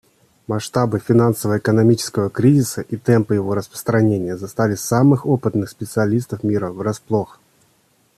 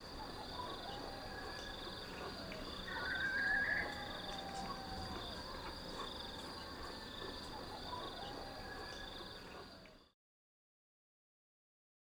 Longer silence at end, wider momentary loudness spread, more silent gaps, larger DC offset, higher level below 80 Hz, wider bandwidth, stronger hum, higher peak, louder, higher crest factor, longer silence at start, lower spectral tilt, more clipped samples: second, 0.95 s vs 2.05 s; about the same, 9 LU vs 11 LU; neither; neither; about the same, -54 dBFS vs -58 dBFS; second, 14 kHz vs over 20 kHz; neither; first, -2 dBFS vs -26 dBFS; first, -18 LUFS vs -44 LUFS; about the same, 16 dB vs 20 dB; first, 0.5 s vs 0 s; first, -6.5 dB/octave vs -3.5 dB/octave; neither